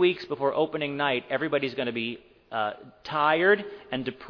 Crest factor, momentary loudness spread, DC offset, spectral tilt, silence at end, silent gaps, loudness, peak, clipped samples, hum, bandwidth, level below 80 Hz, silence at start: 18 dB; 12 LU; under 0.1%; -7 dB/octave; 0 s; none; -27 LUFS; -8 dBFS; under 0.1%; none; 5.4 kHz; -66 dBFS; 0 s